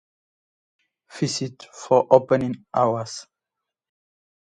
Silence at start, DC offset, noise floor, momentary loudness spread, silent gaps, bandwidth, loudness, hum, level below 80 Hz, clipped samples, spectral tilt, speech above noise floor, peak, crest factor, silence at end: 1.15 s; under 0.1%; -85 dBFS; 17 LU; none; 10 kHz; -21 LUFS; none; -64 dBFS; under 0.1%; -5.5 dB/octave; 64 dB; 0 dBFS; 24 dB; 1.25 s